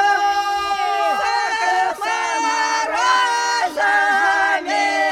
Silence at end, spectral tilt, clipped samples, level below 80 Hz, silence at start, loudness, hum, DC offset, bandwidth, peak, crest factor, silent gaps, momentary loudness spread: 0 s; 0 dB/octave; under 0.1%; -58 dBFS; 0 s; -18 LUFS; none; under 0.1%; 16 kHz; -4 dBFS; 14 dB; none; 4 LU